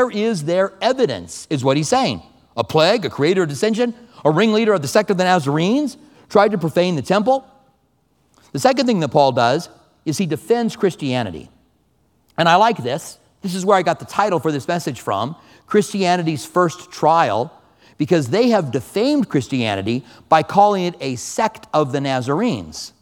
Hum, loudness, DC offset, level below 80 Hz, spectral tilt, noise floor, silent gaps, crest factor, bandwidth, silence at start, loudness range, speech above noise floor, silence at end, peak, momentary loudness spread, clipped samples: none; -18 LUFS; under 0.1%; -58 dBFS; -5.5 dB/octave; -62 dBFS; none; 18 dB; 18 kHz; 0 s; 3 LU; 44 dB; 0.15 s; 0 dBFS; 11 LU; under 0.1%